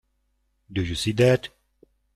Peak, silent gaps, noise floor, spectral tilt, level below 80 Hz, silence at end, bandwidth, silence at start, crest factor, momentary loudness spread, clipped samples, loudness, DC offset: -6 dBFS; none; -71 dBFS; -5.5 dB/octave; -50 dBFS; 0.7 s; 13.5 kHz; 0.7 s; 20 dB; 13 LU; under 0.1%; -23 LUFS; under 0.1%